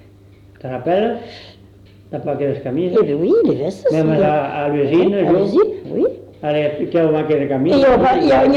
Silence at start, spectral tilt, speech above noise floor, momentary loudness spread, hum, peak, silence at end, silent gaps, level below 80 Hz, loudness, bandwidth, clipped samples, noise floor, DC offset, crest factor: 0.65 s; -8 dB/octave; 29 dB; 12 LU; none; -4 dBFS; 0 s; none; -46 dBFS; -16 LUFS; 8.2 kHz; under 0.1%; -44 dBFS; under 0.1%; 12 dB